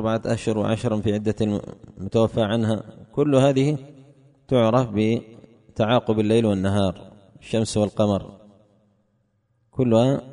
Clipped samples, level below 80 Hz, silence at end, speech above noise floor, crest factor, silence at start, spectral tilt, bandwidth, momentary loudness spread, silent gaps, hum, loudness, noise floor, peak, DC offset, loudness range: under 0.1%; -52 dBFS; 0 s; 47 dB; 18 dB; 0 s; -7 dB/octave; 10.5 kHz; 11 LU; none; none; -22 LUFS; -68 dBFS; -6 dBFS; under 0.1%; 3 LU